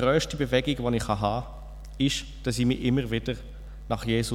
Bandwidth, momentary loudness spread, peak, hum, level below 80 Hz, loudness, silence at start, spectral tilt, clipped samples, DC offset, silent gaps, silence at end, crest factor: 16 kHz; 17 LU; -10 dBFS; none; -40 dBFS; -27 LUFS; 0 s; -5.5 dB/octave; under 0.1%; under 0.1%; none; 0 s; 18 dB